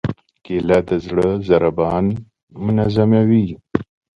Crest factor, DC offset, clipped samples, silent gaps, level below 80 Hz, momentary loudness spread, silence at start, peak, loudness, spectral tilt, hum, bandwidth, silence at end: 18 dB; under 0.1%; under 0.1%; 2.43-2.47 s; -42 dBFS; 11 LU; 0.05 s; 0 dBFS; -18 LUFS; -9 dB/octave; none; 7.4 kHz; 0.3 s